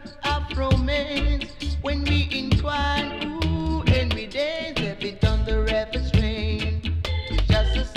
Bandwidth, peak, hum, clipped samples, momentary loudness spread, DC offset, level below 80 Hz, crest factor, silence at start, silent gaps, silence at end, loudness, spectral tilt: 10.5 kHz; -10 dBFS; none; under 0.1%; 5 LU; under 0.1%; -26 dBFS; 14 dB; 0 s; none; 0 s; -24 LUFS; -6.5 dB/octave